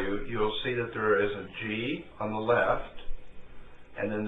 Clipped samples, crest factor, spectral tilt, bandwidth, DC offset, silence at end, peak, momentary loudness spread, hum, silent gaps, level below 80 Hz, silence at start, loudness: under 0.1%; 18 dB; -8 dB/octave; 4 kHz; under 0.1%; 0 s; -12 dBFS; 20 LU; none; none; -44 dBFS; 0 s; -30 LUFS